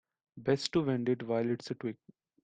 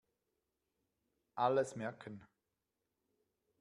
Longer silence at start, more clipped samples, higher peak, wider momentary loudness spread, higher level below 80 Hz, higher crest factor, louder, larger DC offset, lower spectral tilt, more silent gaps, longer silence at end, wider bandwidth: second, 0.35 s vs 1.35 s; neither; first, -12 dBFS vs -20 dBFS; second, 10 LU vs 19 LU; first, -68 dBFS vs -84 dBFS; about the same, 22 dB vs 24 dB; first, -33 LUFS vs -37 LUFS; neither; about the same, -6 dB/octave vs -5.5 dB/octave; neither; second, 0.5 s vs 1.35 s; second, 9.4 kHz vs 11.5 kHz